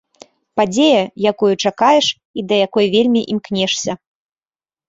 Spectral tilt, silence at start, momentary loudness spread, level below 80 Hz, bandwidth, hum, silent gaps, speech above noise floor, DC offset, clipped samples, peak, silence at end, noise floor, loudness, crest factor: -4 dB/octave; 0.55 s; 9 LU; -58 dBFS; 8 kHz; none; 2.25-2.34 s; over 75 dB; under 0.1%; under 0.1%; -2 dBFS; 0.95 s; under -90 dBFS; -15 LUFS; 16 dB